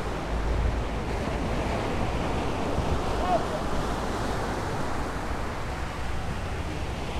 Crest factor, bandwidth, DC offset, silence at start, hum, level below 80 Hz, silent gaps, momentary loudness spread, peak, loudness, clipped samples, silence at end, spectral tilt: 16 dB; 14 kHz; under 0.1%; 0 s; none; -34 dBFS; none; 5 LU; -12 dBFS; -30 LUFS; under 0.1%; 0 s; -6 dB/octave